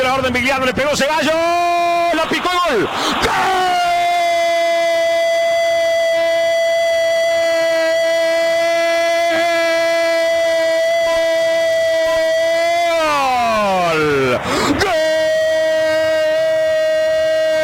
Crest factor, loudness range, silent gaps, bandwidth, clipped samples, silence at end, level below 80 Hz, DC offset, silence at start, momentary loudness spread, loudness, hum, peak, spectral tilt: 10 dB; 0 LU; none; 17 kHz; under 0.1%; 0 s; -46 dBFS; under 0.1%; 0 s; 1 LU; -15 LUFS; none; -6 dBFS; -3 dB/octave